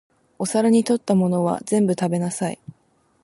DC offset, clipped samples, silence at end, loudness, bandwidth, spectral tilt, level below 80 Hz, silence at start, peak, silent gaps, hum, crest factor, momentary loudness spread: under 0.1%; under 0.1%; 0.7 s; -21 LUFS; 11.5 kHz; -6.5 dB/octave; -64 dBFS; 0.4 s; -6 dBFS; none; none; 16 dB; 10 LU